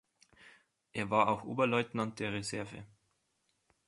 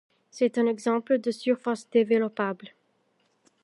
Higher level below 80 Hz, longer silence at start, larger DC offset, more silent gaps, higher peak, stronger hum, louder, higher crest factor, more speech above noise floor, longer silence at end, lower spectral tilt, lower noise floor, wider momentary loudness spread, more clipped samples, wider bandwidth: first, -68 dBFS vs -84 dBFS; about the same, 0.45 s vs 0.35 s; neither; neither; second, -14 dBFS vs -10 dBFS; neither; second, -34 LUFS vs -26 LUFS; about the same, 22 dB vs 18 dB; about the same, 45 dB vs 45 dB; about the same, 1 s vs 0.95 s; about the same, -5 dB/octave vs -5.5 dB/octave; first, -79 dBFS vs -70 dBFS; first, 14 LU vs 7 LU; neither; about the same, 11.5 kHz vs 11.5 kHz